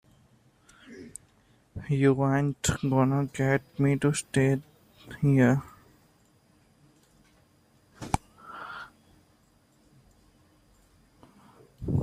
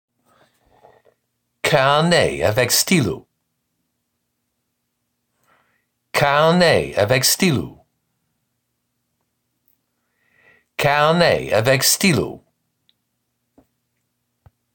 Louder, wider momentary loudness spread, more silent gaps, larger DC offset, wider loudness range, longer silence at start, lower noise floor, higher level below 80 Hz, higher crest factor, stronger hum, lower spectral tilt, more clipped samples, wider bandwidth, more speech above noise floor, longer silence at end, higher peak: second, -26 LUFS vs -16 LUFS; first, 23 LU vs 10 LU; neither; neither; first, 15 LU vs 6 LU; second, 0.9 s vs 1.65 s; second, -64 dBFS vs -74 dBFS; about the same, -52 dBFS vs -52 dBFS; first, 24 dB vs 18 dB; neither; first, -6.5 dB/octave vs -3.5 dB/octave; neither; about the same, 15.5 kHz vs 17 kHz; second, 39 dB vs 58 dB; second, 0 s vs 2.4 s; about the same, -6 dBFS vs -4 dBFS